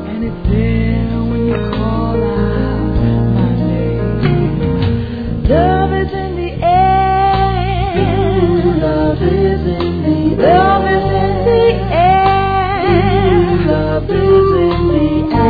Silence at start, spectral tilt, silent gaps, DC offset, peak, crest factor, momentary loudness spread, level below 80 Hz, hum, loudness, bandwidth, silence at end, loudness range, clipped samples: 0 s; -10.5 dB/octave; none; 0.4%; 0 dBFS; 12 dB; 6 LU; -22 dBFS; none; -13 LUFS; 5 kHz; 0 s; 3 LU; under 0.1%